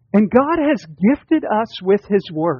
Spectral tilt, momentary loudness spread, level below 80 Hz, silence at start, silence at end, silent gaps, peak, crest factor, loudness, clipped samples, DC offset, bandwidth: -6 dB/octave; 5 LU; -52 dBFS; 0.15 s; 0 s; none; -2 dBFS; 14 dB; -17 LUFS; under 0.1%; under 0.1%; 7 kHz